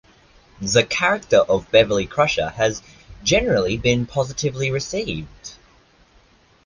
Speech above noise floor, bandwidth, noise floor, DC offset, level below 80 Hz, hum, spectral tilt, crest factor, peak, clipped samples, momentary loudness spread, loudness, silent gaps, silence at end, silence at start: 35 dB; 10 kHz; -55 dBFS; under 0.1%; -42 dBFS; none; -4 dB/octave; 18 dB; -2 dBFS; under 0.1%; 14 LU; -20 LUFS; none; 1.1 s; 0.6 s